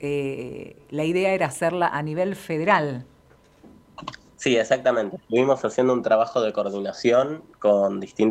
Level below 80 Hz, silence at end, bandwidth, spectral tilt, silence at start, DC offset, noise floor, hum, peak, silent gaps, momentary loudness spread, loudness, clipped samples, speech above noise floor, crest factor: -62 dBFS; 0 s; 14.5 kHz; -5.5 dB/octave; 0 s; under 0.1%; -55 dBFS; none; -4 dBFS; none; 13 LU; -23 LUFS; under 0.1%; 33 dB; 20 dB